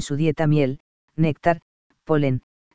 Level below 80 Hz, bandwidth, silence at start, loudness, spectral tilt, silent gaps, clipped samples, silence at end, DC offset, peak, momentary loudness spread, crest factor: -50 dBFS; 8 kHz; 0 s; -22 LUFS; -7.5 dB/octave; 0.80-1.08 s, 1.62-1.90 s, 2.43-2.71 s; under 0.1%; 0 s; 2%; -4 dBFS; 10 LU; 18 dB